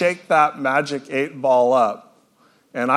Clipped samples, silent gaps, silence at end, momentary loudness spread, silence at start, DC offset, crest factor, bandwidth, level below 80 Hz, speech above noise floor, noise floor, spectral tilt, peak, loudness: under 0.1%; none; 0 s; 10 LU; 0 s; under 0.1%; 18 dB; 12.5 kHz; -74 dBFS; 39 dB; -58 dBFS; -5 dB/octave; -2 dBFS; -19 LUFS